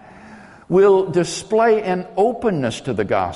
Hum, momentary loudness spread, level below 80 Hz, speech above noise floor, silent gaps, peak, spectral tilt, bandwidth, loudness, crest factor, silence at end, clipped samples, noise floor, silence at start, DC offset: none; 9 LU; -52 dBFS; 25 dB; none; -4 dBFS; -5.5 dB/octave; 11.5 kHz; -18 LUFS; 14 dB; 0 s; under 0.1%; -42 dBFS; 0.25 s; under 0.1%